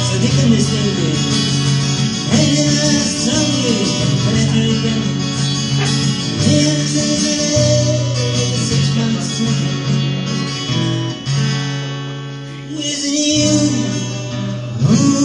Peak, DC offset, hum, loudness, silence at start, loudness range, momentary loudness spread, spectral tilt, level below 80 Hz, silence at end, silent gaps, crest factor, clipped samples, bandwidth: 0 dBFS; under 0.1%; none; -15 LUFS; 0 s; 4 LU; 8 LU; -4.5 dB/octave; -40 dBFS; 0 s; none; 14 dB; under 0.1%; 11.5 kHz